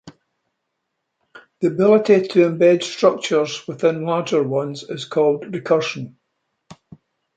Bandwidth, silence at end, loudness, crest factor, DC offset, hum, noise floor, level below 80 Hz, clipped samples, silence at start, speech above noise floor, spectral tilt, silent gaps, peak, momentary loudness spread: 9 kHz; 0.65 s; -18 LUFS; 18 dB; under 0.1%; none; -76 dBFS; -68 dBFS; under 0.1%; 0.05 s; 59 dB; -5.5 dB/octave; none; -2 dBFS; 11 LU